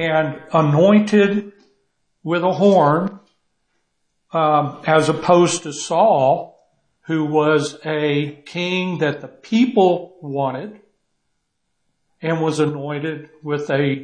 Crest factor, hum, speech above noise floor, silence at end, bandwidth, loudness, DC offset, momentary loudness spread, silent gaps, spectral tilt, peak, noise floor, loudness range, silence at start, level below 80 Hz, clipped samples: 16 dB; none; 54 dB; 0 s; 9.8 kHz; -18 LUFS; under 0.1%; 12 LU; none; -6 dB/octave; -2 dBFS; -71 dBFS; 7 LU; 0 s; -64 dBFS; under 0.1%